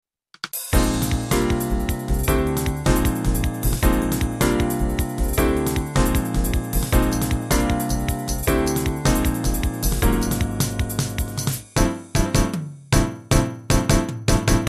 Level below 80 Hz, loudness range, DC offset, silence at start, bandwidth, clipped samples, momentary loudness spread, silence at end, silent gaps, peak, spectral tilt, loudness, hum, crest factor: -26 dBFS; 1 LU; under 0.1%; 0.45 s; 14 kHz; under 0.1%; 4 LU; 0 s; none; -2 dBFS; -5 dB/octave; -22 LUFS; none; 18 dB